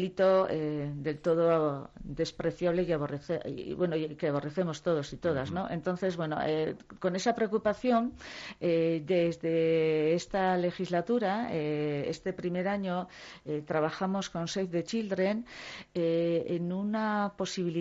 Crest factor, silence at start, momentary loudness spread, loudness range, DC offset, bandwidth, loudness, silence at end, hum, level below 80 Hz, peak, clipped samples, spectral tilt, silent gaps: 16 dB; 0 s; 8 LU; 4 LU; under 0.1%; 8 kHz; -31 LUFS; 0 s; none; -60 dBFS; -16 dBFS; under 0.1%; -6.5 dB/octave; none